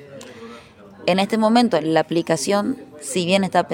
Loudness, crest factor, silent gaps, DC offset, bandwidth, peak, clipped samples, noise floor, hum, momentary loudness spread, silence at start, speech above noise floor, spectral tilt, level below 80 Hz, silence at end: -19 LUFS; 18 dB; none; under 0.1%; 17 kHz; -4 dBFS; under 0.1%; -43 dBFS; none; 21 LU; 0 s; 24 dB; -4.5 dB/octave; -64 dBFS; 0 s